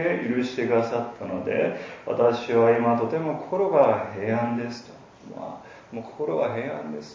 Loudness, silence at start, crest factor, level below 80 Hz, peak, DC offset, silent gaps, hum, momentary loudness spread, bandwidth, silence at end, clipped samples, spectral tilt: -24 LUFS; 0 s; 20 dB; -64 dBFS; -6 dBFS; under 0.1%; none; none; 18 LU; 7.4 kHz; 0 s; under 0.1%; -7 dB/octave